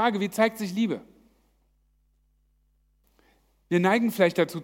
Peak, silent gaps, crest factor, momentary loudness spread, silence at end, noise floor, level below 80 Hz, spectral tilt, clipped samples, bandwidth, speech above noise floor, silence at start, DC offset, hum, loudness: -6 dBFS; none; 20 dB; 6 LU; 0 s; -67 dBFS; -68 dBFS; -6 dB/octave; under 0.1%; 16.5 kHz; 43 dB; 0 s; under 0.1%; none; -25 LUFS